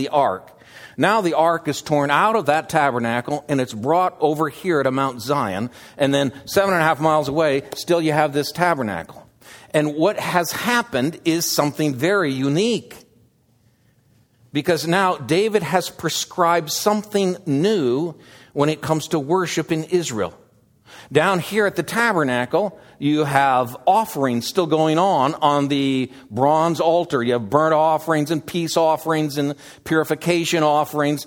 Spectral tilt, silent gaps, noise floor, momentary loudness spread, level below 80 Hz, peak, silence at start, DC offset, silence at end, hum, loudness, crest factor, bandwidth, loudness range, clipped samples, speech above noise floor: -5 dB/octave; none; -59 dBFS; 6 LU; -60 dBFS; 0 dBFS; 0 s; under 0.1%; 0 s; none; -20 LUFS; 20 dB; 19.5 kHz; 3 LU; under 0.1%; 40 dB